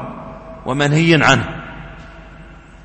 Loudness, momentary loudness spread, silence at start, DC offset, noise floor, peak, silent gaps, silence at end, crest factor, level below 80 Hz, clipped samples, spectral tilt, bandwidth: -14 LUFS; 23 LU; 0 s; under 0.1%; -39 dBFS; 0 dBFS; none; 0.3 s; 18 dB; -40 dBFS; under 0.1%; -5 dB/octave; 8.8 kHz